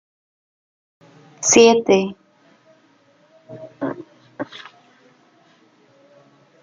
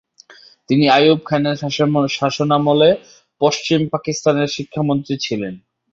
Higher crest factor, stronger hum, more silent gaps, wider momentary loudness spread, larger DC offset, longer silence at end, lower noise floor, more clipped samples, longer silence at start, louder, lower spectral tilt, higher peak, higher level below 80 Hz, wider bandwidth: first, 22 dB vs 16 dB; neither; neither; first, 27 LU vs 9 LU; neither; first, 2.2 s vs 0.35 s; first, -56 dBFS vs -46 dBFS; neither; first, 1.4 s vs 0.7 s; about the same, -16 LUFS vs -17 LUFS; second, -3 dB/octave vs -5.5 dB/octave; about the same, 0 dBFS vs -2 dBFS; second, -66 dBFS vs -58 dBFS; first, 9.6 kHz vs 7.8 kHz